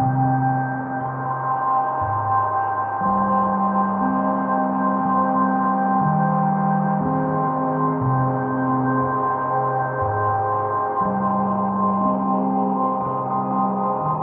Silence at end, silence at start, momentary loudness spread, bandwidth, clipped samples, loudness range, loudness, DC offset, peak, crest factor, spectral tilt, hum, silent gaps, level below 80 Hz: 0 s; 0 s; 3 LU; 3.3 kHz; under 0.1%; 1 LU; -21 LUFS; under 0.1%; -8 dBFS; 12 dB; -10 dB/octave; none; none; -56 dBFS